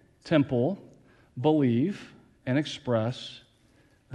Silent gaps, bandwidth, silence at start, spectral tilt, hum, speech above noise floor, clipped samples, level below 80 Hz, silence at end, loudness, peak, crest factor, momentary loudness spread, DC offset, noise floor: none; 10 kHz; 0.25 s; -7.5 dB/octave; none; 36 dB; under 0.1%; -64 dBFS; 0 s; -27 LUFS; -10 dBFS; 18 dB; 17 LU; under 0.1%; -62 dBFS